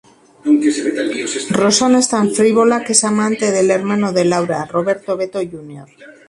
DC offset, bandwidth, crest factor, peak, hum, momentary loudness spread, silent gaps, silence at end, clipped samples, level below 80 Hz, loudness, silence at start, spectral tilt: under 0.1%; 11.5 kHz; 16 dB; 0 dBFS; none; 9 LU; none; 0.2 s; under 0.1%; -58 dBFS; -15 LUFS; 0.45 s; -4 dB/octave